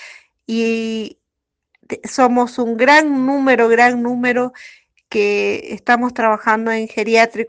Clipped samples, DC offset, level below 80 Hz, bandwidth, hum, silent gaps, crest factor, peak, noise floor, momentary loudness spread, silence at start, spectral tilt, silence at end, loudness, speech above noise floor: under 0.1%; under 0.1%; -62 dBFS; 9.6 kHz; none; none; 16 dB; 0 dBFS; -79 dBFS; 13 LU; 0 s; -4 dB/octave; 0 s; -16 LUFS; 63 dB